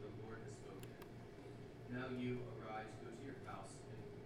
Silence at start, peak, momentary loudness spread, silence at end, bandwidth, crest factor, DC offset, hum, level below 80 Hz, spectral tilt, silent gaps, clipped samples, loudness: 0 s; -34 dBFS; 10 LU; 0 s; 15.5 kHz; 16 dB; under 0.1%; none; -68 dBFS; -6.5 dB/octave; none; under 0.1%; -51 LUFS